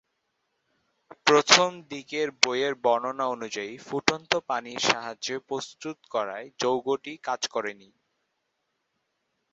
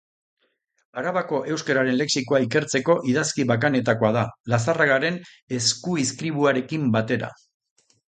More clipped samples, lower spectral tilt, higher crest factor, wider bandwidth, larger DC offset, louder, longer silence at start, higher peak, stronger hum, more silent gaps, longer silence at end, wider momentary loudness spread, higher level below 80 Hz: neither; second, -2 dB/octave vs -4.5 dB/octave; first, 28 dB vs 18 dB; second, 8 kHz vs 9.4 kHz; neither; second, -26 LUFS vs -22 LUFS; first, 1.25 s vs 0.95 s; first, 0 dBFS vs -4 dBFS; neither; second, none vs 4.40-4.44 s, 5.42-5.48 s; first, 1.8 s vs 0.8 s; first, 14 LU vs 7 LU; second, -70 dBFS vs -62 dBFS